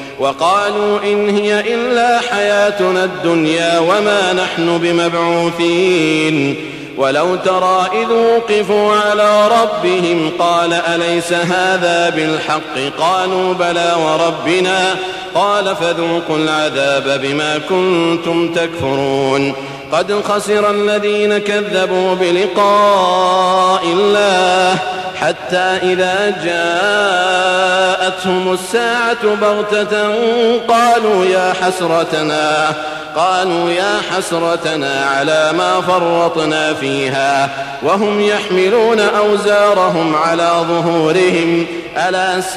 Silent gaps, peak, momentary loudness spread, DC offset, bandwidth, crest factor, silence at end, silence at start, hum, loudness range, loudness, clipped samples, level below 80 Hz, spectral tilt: none; -2 dBFS; 5 LU; under 0.1%; 14 kHz; 10 dB; 0 s; 0 s; none; 3 LU; -13 LUFS; under 0.1%; -54 dBFS; -4 dB/octave